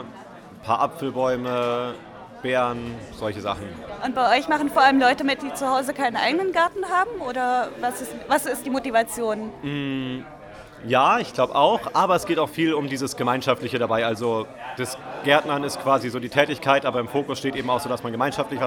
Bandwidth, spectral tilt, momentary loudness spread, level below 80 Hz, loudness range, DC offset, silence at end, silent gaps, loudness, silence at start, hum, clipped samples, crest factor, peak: 19.5 kHz; -4.5 dB/octave; 13 LU; -56 dBFS; 5 LU; under 0.1%; 0 s; none; -23 LUFS; 0 s; none; under 0.1%; 22 dB; -2 dBFS